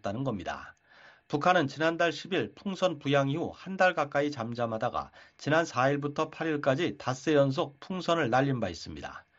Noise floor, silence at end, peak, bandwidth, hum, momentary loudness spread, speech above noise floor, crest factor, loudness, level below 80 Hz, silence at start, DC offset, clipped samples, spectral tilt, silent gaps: -58 dBFS; 0.2 s; -10 dBFS; 8 kHz; none; 11 LU; 28 dB; 20 dB; -29 LUFS; -64 dBFS; 0.05 s; under 0.1%; under 0.1%; -4.5 dB/octave; none